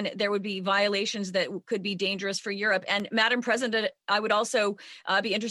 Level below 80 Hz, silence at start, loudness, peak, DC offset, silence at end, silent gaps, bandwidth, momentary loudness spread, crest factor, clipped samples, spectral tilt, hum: -78 dBFS; 0 s; -27 LUFS; -10 dBFS; under 0.1%; 0 s; none; 12.5 kHz; 6 LU; 18 dB; under 0.1%; -3 dB/octave; none